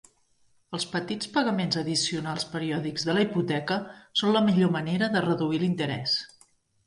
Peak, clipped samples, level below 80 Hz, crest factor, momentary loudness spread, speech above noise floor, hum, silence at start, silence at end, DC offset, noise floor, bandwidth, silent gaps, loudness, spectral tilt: -10 dBFS; under 0.1%; -66 dBFS; 18 dB; 8 LU; 38 dB; none; 0.7 s; 0.6 s; under 0.1%; -65 dBFS; 11.5 kHz; none; -27 LUFS; -5 dB/octave